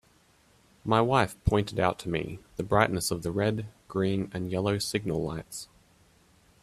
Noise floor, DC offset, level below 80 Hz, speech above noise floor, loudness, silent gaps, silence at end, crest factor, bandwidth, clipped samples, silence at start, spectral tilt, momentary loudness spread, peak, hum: -63 dBFS; under 0.1%; -48 dBFS; 35 dB; -29 LUFS; none; 0.95 s; 24 dB; 15 kHz; under 0.1%; 0.85 s; -5.5 dB/octave; 13 LU; -6 dBFS; none